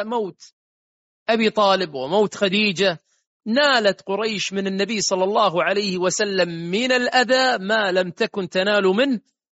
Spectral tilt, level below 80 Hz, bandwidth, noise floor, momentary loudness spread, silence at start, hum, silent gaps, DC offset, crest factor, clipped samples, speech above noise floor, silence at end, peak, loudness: -2 dB/octave; -66 dBFS; 8 kHz; under -90 dBFS; 7 LU; 0 s; none; 0.53-1.26 s, 3.27-3.40 s; under 0.1%; 16 dB; under 0.1%; over 70 dB; 0.4 s; -4 dBFS; -20 LUFS